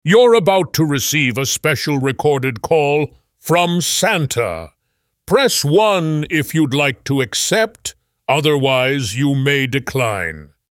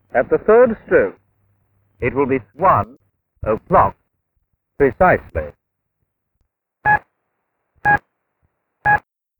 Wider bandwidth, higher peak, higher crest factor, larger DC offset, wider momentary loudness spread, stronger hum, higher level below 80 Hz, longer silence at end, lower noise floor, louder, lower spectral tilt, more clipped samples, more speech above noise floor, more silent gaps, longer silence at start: second, 17 kHz vs over 20 kHz; about the same, -2 dBFS vs -2 dBFS; about the same, 16 dB vs 18 dB; neither; second, 8 LU vs 11 LU; neither; second, -50 dBFS vs -40 dBFS; second, 0.25 s vs 0.4 s; about the same, -70 dBFS vs -73 dBFS; about the same, -16 LUFS vs -17 LUFS; second, -4 dB/octave vs -9.5 dB/octave; neither; about the same, 55 dB vs 58 dB; neither; about the same, 0.05 s vs 0.15 s